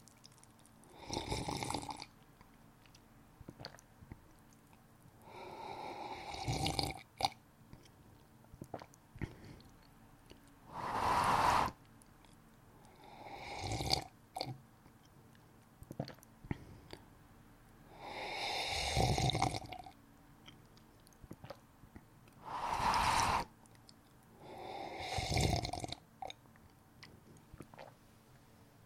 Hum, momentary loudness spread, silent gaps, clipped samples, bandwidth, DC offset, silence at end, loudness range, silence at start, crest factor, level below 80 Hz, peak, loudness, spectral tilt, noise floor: none; 27 LU; none; under 0.1%; 16.5 kHz; under 0.1%; 0 s; 15 LU; 0 s; 30 dB; -56 dBFS; -12 dBFS; -38 LUFS; -4 dB/octave; -63 dBFS